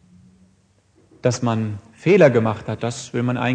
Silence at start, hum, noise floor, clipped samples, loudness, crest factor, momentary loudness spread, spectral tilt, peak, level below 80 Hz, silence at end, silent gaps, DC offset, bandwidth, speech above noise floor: 1.25 s; none; -59 dBFS; under 0.1%; -20 LUFS; 20 dB; 13 LU; -6.5 dB/octave; 0 dBFS; -58 dBFS; 0 s; none; under 0.1%; 9.6 kHz; 40 dB